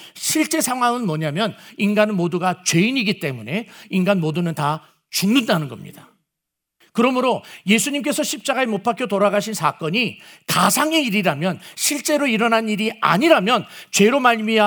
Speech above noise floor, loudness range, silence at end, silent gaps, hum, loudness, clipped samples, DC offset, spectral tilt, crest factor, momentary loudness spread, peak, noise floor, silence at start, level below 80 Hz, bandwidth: 63 dB; 4 LU; 0 s; none; none; -19 LUFS; under 0.1%; under 0.1%; -4 dB/octave; 20 dB; 9 LU; 0 dBFS; -82 dBFS; 0 s; -72 dBFS; over 20 kHz